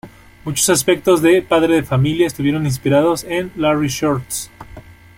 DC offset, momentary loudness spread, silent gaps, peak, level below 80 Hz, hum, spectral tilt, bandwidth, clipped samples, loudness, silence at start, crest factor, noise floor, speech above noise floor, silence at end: under 0.1%; 10 LU; none; -2 dBFS; -44 dBFS; none; -5 dB/octave; 16.5 kHz; under 0.1%; -16 LUFS; 0.05 s; 16 dB; -39 dBFS; 23 dB; 0.25 s